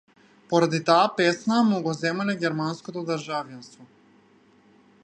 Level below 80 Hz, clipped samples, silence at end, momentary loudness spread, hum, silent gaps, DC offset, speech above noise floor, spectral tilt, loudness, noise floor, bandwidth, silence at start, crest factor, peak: -74 dBFS; under 0.1%; 1.2 s; 12 LU; none; none; under 0.1%; 34 dB; -5.5 dB/octave; -24 LUFS; -58 dBFS; 10.5 kHz; 0.5 s; 22 dB; -4 dBFS